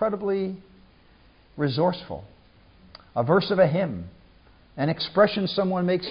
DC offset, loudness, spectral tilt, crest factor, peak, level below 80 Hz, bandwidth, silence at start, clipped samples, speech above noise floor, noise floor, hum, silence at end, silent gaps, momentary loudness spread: under 0.1%; -24 LUFS; -11 dB/octave; 18 dB; -6 dBFS; -56 dBFS; 5.4 kHz; 0 s; under 0.1%; 32 dB; -55 dBFS; none; 0 s; none; 18 LU